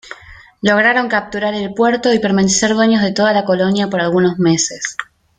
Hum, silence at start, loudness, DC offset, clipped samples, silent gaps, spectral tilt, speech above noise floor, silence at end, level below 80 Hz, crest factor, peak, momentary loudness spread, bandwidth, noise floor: none; 0.05 s; -14 LUFS; under 0.1%; under 0.1%; none; -4 dB/octave; 26 dB; 0.35 s; -50 dBFS; 14 dB; -2 dBFS; 8 LU; 9.6 kHz; -40 dBFS